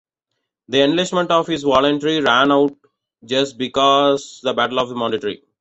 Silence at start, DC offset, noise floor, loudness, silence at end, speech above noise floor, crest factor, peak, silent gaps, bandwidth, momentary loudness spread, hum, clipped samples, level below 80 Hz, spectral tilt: 0.7 s; under 0.1%; -77 dBFS; -17 LUFS; 0.25 s; 60 dB; 16 dB; -2 dBFS; none; 8.2 kHz; 8 LU; none; under 0.1%; -56 dBFS; -4.5 dB/octave